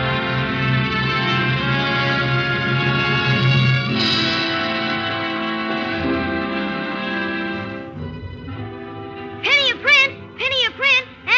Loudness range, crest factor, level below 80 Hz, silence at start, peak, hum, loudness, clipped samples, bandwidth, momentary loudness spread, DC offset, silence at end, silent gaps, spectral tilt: 6 LU; 16 dB; -46 dBFS; 0 s; -2 dBFS; none; -18 LUFS; under 0.1%; 7.4 kHz; 17 LU; under 0.1%; 0 s; none; -5.5 dB/octave